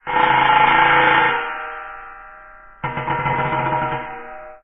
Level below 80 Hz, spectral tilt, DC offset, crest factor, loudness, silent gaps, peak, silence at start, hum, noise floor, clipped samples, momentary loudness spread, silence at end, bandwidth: -46 dBFS; -7.5 dB/octave; under 0.1%; 18 dB; -16 LUFS; none; -2 dBFS; 0.05 s; none; -42 dBFS; under 0.1%; 21 LU; 0.05 s; 5.6 kHz